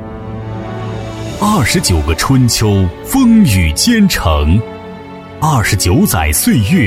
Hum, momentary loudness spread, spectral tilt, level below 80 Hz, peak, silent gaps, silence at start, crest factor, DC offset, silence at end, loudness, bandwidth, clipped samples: none; 15 LU; -5 dB/octave; -24 dBFS; 0 dBFS; none; 0 s; 12 dB; under 0.1%; 0 s; -11 LUFS; 16.5 kHz; under 0.1%